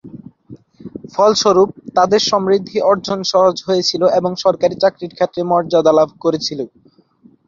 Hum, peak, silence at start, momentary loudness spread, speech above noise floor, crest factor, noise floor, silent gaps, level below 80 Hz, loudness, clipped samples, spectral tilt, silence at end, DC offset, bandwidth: none; 0 dBFS; 0.05 s; 8 LU; 36 dB; 14 dB; -50 dBFS; none; -56 dBFS; -15 LUFS; under 0.1%; -4.5 dB/octave; 0.8 s; under 0.1%; 7.6 kHz